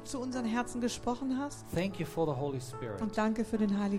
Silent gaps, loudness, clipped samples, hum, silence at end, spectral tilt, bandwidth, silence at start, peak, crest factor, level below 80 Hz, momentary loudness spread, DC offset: none; -34 LUFS; under 0.1%; none; 0 s; -6 dB/octave; 16 kHz; 0 s; -20 dBFS; 14 dB; -56 dBFS; 6 LU; under 0.1%